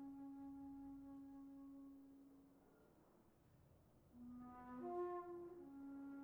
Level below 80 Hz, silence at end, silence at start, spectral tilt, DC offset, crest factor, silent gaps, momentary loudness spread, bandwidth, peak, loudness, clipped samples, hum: -80 dBFS; 0 s; 0 s; -8 dB/octave; under 0.1%; 18 dB; none; 16 LU; over 20 kHz; -38 dBFS; -55 LUFS; under 0.1%; none